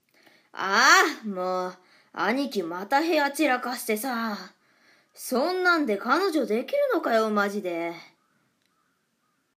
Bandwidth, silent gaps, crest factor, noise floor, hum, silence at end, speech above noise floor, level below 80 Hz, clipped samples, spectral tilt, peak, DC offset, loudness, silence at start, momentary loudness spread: 15.5 kHz; none; 22 dB; -73 dBFS; none; 1.55 s; 48 dB; -88 dBFS; under 0.1%; -3 dB/octave; -4 dBFS; under 0.1%; -24 LUFS; 0.55 s; 13 LU